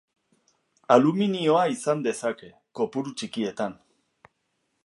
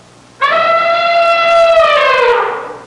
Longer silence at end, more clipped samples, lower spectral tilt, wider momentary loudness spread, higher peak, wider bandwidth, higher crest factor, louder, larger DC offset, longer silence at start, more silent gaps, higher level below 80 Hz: first, 1.1 s vs 0 s; neither; first, -5.5 dB/octave vs -2 dB/octave; first, 13 LU vs 6 LU; about the same, -2 dBFS vs -2 dBFS; about the same, 11.5 kHz vs 11 kHz; first, 24 dB vs 8 dB; second, -25 LUFS vs -10 LUFS; neither; first, 0.9 s vs 0.4 s; neither; second, -74 dBFS vs -48 dBFS